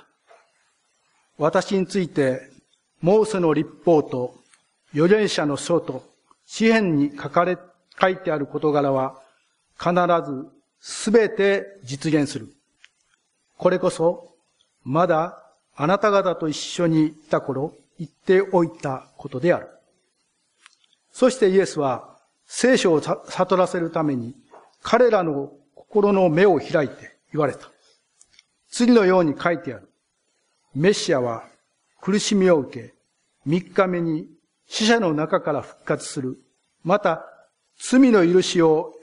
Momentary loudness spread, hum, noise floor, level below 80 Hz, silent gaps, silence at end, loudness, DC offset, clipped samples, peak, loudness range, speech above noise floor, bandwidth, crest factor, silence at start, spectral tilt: 15 LU; none; -71 dBFS; -64 dBFS; none; 0.05 s; -21 LUFS; under 0.1%; under 0.1%; 0 dBFS; 3 LU; 51 dB; 10.5 kHz; 22 dB; 1.4 s; -5.5 dB/octave